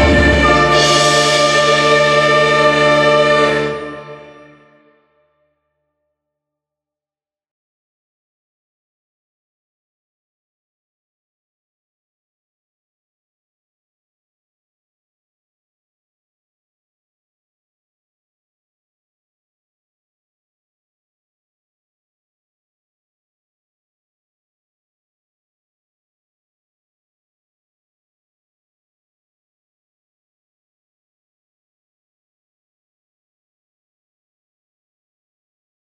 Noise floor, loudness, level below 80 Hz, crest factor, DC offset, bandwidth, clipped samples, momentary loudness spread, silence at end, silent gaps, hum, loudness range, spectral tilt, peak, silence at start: under -90 dBFS; -11 LUFS; -36 dBFS; 20 dB; under 0.1%; 13 kHz; under 0.1%; 8 LU; 31.6 s; none; none; 11 LU; -3.5 dB/octave; 0 dBFS; 0 s